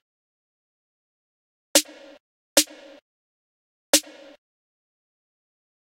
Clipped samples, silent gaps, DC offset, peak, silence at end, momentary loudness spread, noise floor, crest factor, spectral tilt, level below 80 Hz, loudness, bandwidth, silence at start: under 0.1%; 2.20-2.56 s, 3.02-3.93 s; under 0.1%; -2 dBFS; 1.9 s; 7 LU; under -90 dBFS; 28 dB; 1 dB/octave; -70 dBFS; -21 LUFS; 16 kHz; 1.75 s